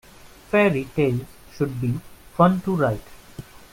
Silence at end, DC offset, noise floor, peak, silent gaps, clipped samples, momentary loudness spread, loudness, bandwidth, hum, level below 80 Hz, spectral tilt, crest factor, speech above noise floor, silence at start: 0.3 s; under 0.1%; -41 dBFS; -4 dBFS; none; under 0.1%; 23 LU; -22 LUFS; 16.5 kHz; none; -50 dBFS; -7.5 dB/octave; 20 dB; 21 dB; 0.25 s